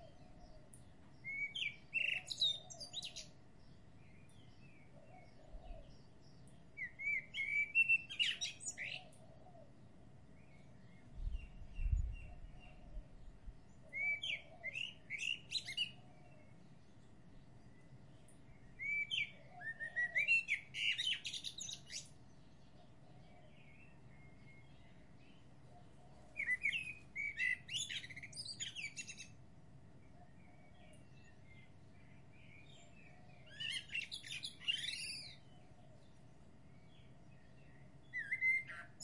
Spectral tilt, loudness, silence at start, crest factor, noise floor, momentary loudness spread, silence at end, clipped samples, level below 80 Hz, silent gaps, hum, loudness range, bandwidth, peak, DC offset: -1 dB/octave; -40 LUFS; 0 s; 22 dB; -64 dBFS; 27 LU; 0 s; under 0.1%; -56 dBFS; none; none; 22 LU; 11.5 kHz; -24 dBFS; under 0.1%